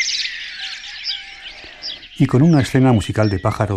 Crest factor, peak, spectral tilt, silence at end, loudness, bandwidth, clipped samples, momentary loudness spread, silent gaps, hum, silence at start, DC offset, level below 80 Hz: 16 dB; -2 dBFS; -5.5 dB/octave; 0 s; -18 LUFS; 13 kHz; under 0.1%; 16 LU; none; none; 0 s; under 0.1%; -44 dBFS